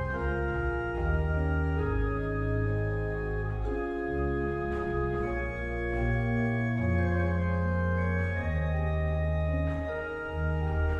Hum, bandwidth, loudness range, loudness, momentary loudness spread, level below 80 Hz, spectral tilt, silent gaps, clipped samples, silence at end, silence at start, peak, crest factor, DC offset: none; 6.6 kHz; 2 LU; -30 LUFS; 4 LU; -34 dBFS; -9.5 dB/octave; none; under 0.1%; 0 s; 0 s; -18 dBFS; 12 dB; under 0.1%